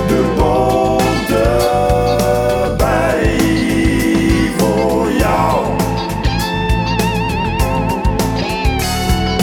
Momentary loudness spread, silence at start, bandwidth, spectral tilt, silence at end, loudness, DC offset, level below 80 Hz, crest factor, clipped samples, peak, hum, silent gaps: 4 LU; 0 s; 19 kHz; -5.5 dB/octave; 0 s; -15 LUFS; under 0.1%; -22 dBFS; 14 dB; under 0.1%; 0 dBFS; none; none